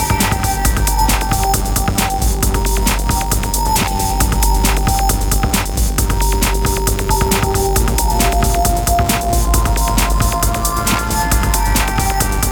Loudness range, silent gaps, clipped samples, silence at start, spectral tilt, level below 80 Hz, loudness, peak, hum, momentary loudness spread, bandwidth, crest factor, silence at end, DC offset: 1 LU; none; under 0.1%; 0 s; -4 dB/octave; -18 dBFS; -15 LUFS; 0 dBFS; none; 2 LU; over 20 kHz; 14 dB; 0 s; under 0.1%